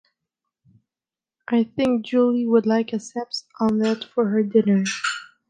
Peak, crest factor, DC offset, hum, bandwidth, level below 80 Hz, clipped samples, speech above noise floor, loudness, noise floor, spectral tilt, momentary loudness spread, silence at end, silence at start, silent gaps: -6 dBFS; 18 dB; under 0.1%; none; 9.4 kHz; -64 dBFS; under 0.1%; over 69 dB; -22 LUFS; under -90 dBFS; -5.5 dB/octave; 9 LU; 0.25 s; 1.5 s; none